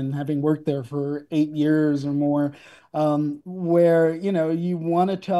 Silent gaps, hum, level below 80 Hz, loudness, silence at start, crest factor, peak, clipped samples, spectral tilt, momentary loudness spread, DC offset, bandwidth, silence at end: none; none; -68 dBFS; -23 LUFS; 0 s; 14 dB; -8 dBFS; under 0.1%; -8.5 dB/octave; 9 LU; under 0.1%; 12 kHz; 0 s